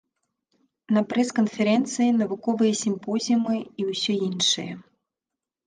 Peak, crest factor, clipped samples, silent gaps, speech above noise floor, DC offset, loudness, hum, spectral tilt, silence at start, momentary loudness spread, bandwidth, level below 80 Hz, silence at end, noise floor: -10 dBFS; 16 dB; under 0.1%; none; 64 dB; under 0.1%; -24 LUFS; none; -4 dB/octave; 0.9 s; 6 LU; 10 kHz; -72 dBFS; 0.85 s; -88 dBFS